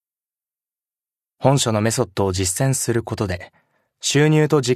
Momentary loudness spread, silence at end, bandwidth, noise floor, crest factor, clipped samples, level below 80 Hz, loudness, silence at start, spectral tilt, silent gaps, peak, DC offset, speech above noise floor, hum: 10 LU; 0 s; 14 kHz; under -90 dBFS; 20 dB; under 0.1%; -52 dBFS; -19 LUFS; 1.4 s; -5 dB/octave; none; 0 dBFS; under 0.1%; over 72 dB; none